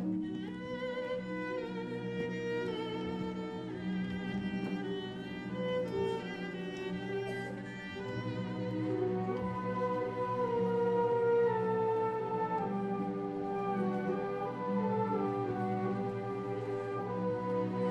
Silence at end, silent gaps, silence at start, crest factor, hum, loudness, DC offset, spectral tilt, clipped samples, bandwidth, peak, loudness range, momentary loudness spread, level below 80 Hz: 0 s; none; 0 s; 14 dB; none; -36 LUFS; under 0.1%; -8 dB/octave; under 0.1%; 9.2 kHz; -20 dBFS; 6 LU; 8 LU; -66 dBFS